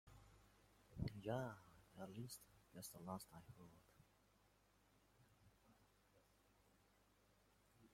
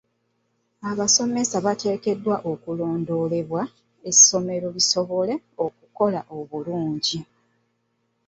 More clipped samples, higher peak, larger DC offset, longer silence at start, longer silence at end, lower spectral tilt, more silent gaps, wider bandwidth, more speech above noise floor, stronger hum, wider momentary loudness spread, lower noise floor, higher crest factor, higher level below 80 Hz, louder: neither; second, -34 dBFS vs -2 dBFS; neither; second, 0.05 s vs 0.8 s; second, 0 s vs 1.05 s; first, -5.5 dB/octave vs -3 dB/octave; neither; first, 16.5 kHz vs 8.4 kHz; second, 24 dB vs 49 dB; first, 50 Hz at -80 dBFS vs none; first, 19 LU vs 15 LU; first, -77 dBFS vs -71 dBFS; about the same, 24 dB vs 22 dB; second, -74 dBFS vs -66 dBFS; second, -54 LUFS vs -21 LUFS